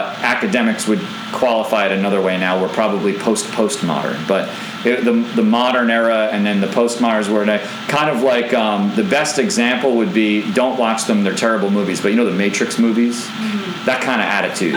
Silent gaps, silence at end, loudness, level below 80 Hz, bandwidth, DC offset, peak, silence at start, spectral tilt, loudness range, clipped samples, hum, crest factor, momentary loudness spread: none; 0 s; -16 LUFS; -66 dBFS; 20 kHz; under 0.1%; -2 dBFS; 0 s; -4.5 dB/octave; 2 LU; under 0.1%; none; 14 dB; 4 LU